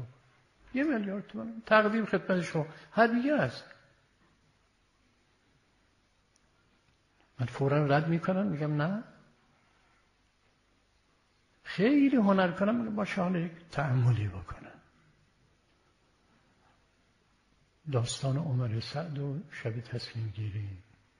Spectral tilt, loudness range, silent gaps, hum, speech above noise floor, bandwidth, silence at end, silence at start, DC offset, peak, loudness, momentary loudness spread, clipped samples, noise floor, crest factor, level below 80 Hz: -7 dB/octave; 9 LU; none; none; 40 dB; 11.5 kHz; 0.4 s; 0 s; under 0.1%; -10 dBFS; -30 LUFS; 15 LU; under 0.1%; -70 dBFS; 22 dB; -64 dBFS